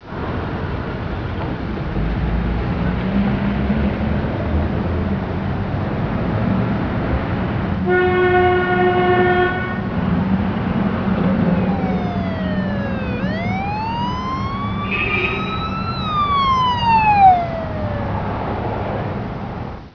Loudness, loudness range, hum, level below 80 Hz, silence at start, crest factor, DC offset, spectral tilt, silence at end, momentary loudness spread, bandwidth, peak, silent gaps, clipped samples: -19 LUFS; 4 LU; none; -30 dBFS; 0 s; 16 dB; under 0.1%; -8.5 dB/octave; 0.05 s; 9 LU; 5.4 kHz; -2 dBFS; none; under 0.1%